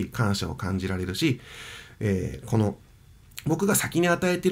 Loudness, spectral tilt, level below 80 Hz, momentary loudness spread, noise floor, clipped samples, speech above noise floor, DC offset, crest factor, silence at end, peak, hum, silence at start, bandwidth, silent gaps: -26 LUFS; -5 dB/octave; -50 dBFS; 17 LU; -52 dBFS; under 0.1%; 27 dB; under 0.1%; 18 dB; 0 s; -8 dBFS; none; 0 s; 16 kHz; none